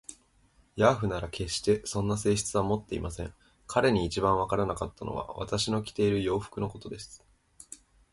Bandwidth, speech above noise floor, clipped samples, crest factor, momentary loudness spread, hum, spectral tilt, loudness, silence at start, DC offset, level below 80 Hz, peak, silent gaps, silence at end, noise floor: 11.5 kHz; 36 dB; under 0.1%; 22 dB; 17 LU; none; -5 dB/octave; -29 LUFS; 0.1 s; under 0.1%; -48 dBFS; -8 dBFS; none; 0.35 s; -64 dBFS